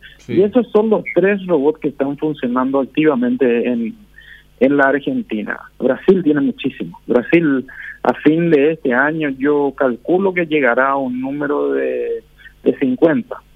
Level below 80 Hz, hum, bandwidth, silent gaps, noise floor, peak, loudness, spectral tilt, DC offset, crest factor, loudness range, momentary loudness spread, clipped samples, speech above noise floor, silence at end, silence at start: -52 dBFS; none; 5.4 kHz; none; -43 dBFS; 0 dBFS; -16 LUFS; -8.5 dB/octave; under 0.1%; 16 dB; 2 LU; 8 LU; under 0.1%; 27 dB; 0.15 s; 0.05 s